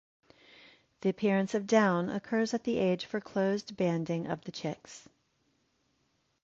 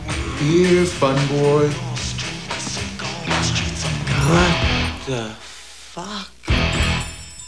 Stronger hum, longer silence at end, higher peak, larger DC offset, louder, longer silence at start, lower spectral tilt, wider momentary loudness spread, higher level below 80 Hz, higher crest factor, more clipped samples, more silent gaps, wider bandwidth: neither; first, 1.45 s vs 0 s; second, -12 dBFS vs -2 dBFS; second, under 0.1% vs 0.5%; second, -31 LUFS vs -20 LUFS; first, 1.05 s vs 0 s; about the same, -6 dB/octave vs -5 dB/octave; second, 12 LU vs 15 LU; second, -70 dBFS vs -32 dBFS; about the same, 20 dB vs 18 dB; neither; neither; second, 7.8 kHz vs 11 kHz